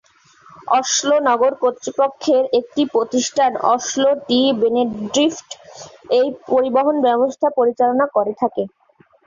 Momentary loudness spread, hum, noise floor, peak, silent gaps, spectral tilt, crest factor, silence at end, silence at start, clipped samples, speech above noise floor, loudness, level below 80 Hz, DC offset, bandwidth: 6 LU; none; -50 dBFS; -2 dBFS; none; -3 dB/octave; 14 dB; 0.6 s; 0.65 s; under 0.1%; 33 dB; -17 LUFS; -62 dBFS; under 0.1%; 7.6 kHz